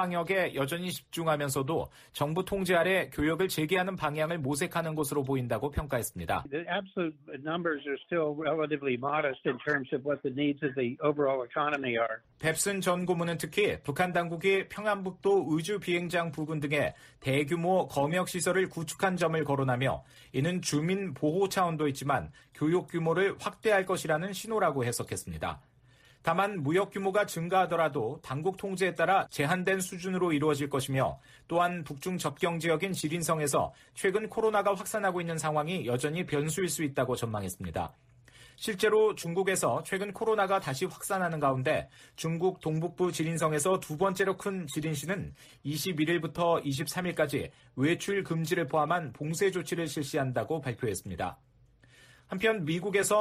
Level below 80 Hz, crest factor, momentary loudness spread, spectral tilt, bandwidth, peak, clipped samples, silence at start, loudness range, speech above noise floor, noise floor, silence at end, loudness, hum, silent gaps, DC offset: -58 dBFS; 16 dB; 7 LU; -5 dB/octave; 15.5 kHz; -16 dBFS; under 0.1%; 0 s; 3 LU; 31 dB; -61 dBFS; 0 s; -30 LUFS; none; none; under 0.1%